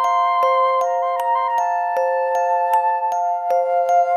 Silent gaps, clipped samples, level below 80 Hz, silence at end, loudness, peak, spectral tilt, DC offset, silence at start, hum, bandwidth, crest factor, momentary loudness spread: none; under 0.1%; under -90 dBFS; 0 s; -19 LUFS; -6 dBFS; 0 dB/octave; under 0.1%; 0 s; none; 14 kHz; 12 dB; 4 LU